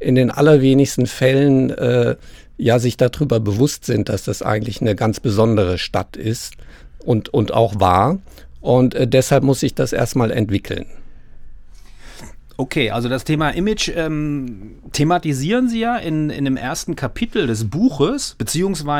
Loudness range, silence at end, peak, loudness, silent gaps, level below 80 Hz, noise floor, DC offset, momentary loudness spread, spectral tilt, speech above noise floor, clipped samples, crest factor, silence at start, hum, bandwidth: 5 LU; 0 s; 0 dBFS; -18 LUFS; none; -38 dBFS; -37 dBFS; under 0.1%; 10 LU; -6 dB/octave; 20 dB; under 0.1%; 18 dB; 0 s; none; 18 kHz